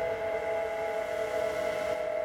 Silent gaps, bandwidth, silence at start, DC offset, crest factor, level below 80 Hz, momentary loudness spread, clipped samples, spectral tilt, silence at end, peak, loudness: none; 16.5 kHz; 0 s; under 0.1%; 12 dB; -58 dBFS; 1 LU; under 0.1%; -4 dB/octave; 0 s; -20 dBFS; -32 LUFS